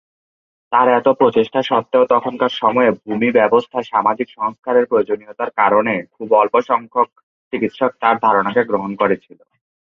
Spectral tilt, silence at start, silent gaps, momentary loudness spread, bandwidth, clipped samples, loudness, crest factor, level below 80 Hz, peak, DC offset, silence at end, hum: -7 dB/octave; 0.7 s; 4.59-4.63 s, 7.23-7.51 s; 9 LU; 6.4 kHz; under 0.1%; -16 LUFS; 16 dB; -62 dBFS; -2 dBFS; under 0.1%; 0.75 s; none